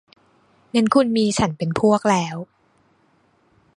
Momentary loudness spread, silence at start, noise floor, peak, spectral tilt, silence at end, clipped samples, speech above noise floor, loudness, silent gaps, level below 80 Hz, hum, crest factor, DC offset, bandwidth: 12 LU; 0.75 s; -61 dBFS; -2 dBFS; -5.5 dB/octave; 1.35 s; under 0.1%; 42 dB; -19 LUFS; none; -52 dBFS; none; 20 dB; under 0.1%; 11 kHz